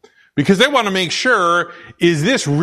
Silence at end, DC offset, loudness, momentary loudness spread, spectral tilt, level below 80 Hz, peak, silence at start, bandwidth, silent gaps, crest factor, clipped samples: 0 s; under 0.1%; -15 LUFS; 7 LU; -4.5 dB/octave; -52 dBFS; 0 dBFS; 0.35 s; 13.5 kHz; none; 16 dB; under 0.1%